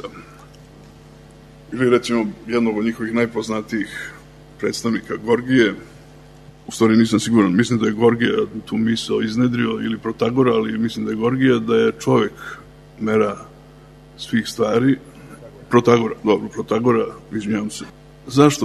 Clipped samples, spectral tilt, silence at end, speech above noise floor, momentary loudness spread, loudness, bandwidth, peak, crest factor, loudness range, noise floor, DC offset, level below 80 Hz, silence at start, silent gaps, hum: under 0.1%; -6 dB/octave; 0 s; 26 dB; 15 LU; -19 LUFS; 13.5 kHz; 0 dBFS; 20 dB; 5 LU; -44 dBFS; under 0.1%; -52 dBFS; 0.05 s; none; none